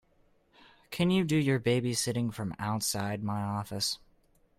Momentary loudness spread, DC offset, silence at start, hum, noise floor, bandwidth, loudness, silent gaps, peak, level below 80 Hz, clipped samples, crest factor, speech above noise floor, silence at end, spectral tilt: 8 LU; under 0.1%; 0.9 s; none; -67 dBFS; 16 kHz; -30 LUFS; none; -14 dBFS; -62 dBFS; under 0.1%; 16 dB; 37 dB; 0.65 s; -5 dB/octave